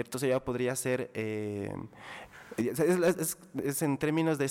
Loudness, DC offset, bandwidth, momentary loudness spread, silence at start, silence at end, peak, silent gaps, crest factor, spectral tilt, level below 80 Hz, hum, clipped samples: -31 LUFS; under 0.1%; 18 kHz; 15 LU; 0 s; 0 s; -18 dBFS; none; 12 dB; -5.5 dB/octave; -64 dBFS; none; under 0.1%